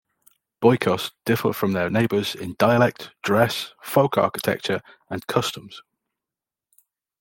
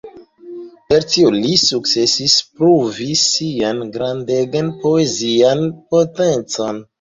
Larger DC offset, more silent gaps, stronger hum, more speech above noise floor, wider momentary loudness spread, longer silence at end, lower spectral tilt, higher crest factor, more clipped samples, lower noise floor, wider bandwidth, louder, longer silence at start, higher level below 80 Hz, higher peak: neither; neither; neither; first, 67 dB vs 20 dB; about the same, 10 LU vs 9 LU; first, 1.4 s vs 0.2 s; first, -5.5 dB/octave vs -4 dB/octave; about the same, 20 dB vs 16 dB; neither; first, -89 dBFS vs -36 dBFS; first, 17 kHz vs 7.8 kHz; second, -22 LUFS vs -15 LUFS; first, 0.6 s vs 0.05 s; second, -62 dBFS vs -54 dBFS; second, -4 dBFS vs 0 dBFS